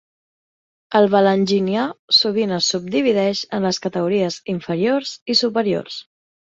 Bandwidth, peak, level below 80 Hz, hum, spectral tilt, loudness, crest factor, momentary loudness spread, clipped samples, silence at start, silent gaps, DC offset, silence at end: 7.8 kHz; -2 dBFS; -62 dBFS; none; -4.5 dB/octave; -18 LUFS; 18 dB; 8 LU; under 0.1%; 0.9 s; 1.99-2.08 s, 5.22-5.26 s; under 0.1%; 0.5 s